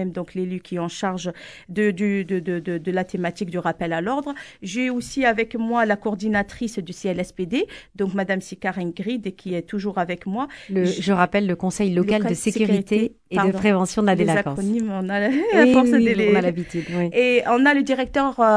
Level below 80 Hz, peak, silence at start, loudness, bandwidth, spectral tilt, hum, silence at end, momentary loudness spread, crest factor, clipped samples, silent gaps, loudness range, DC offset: -52 dBFS; 0 dBFS; 0 s; -22 LUFS; 11 kHz; -6 dB/octave; none; 0 s; 11 LU; 20 dB; under 0.1%; none; 7 LU; under 0.1%